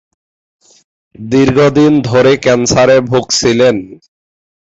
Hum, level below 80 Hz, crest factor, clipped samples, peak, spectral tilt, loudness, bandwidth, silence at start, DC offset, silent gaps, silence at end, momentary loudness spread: none; -42 dBFS; 12 dB; under 0.1%; 0 dBFS; -5 dB/octave; -10 LUFS; 8 kHz; 1.2 s; under 0.1%; none; 0.75 s; 5 LU